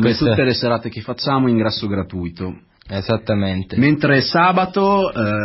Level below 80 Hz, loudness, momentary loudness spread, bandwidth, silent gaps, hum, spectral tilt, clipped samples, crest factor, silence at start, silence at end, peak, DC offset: -42 dBFS; -17 LUFS; 12 LU; 5.8 kHz; none; none; -10 dB/octave; under 0.1%; 16 dB; 0 s; 0 s; -2 dBFS; under 0.1%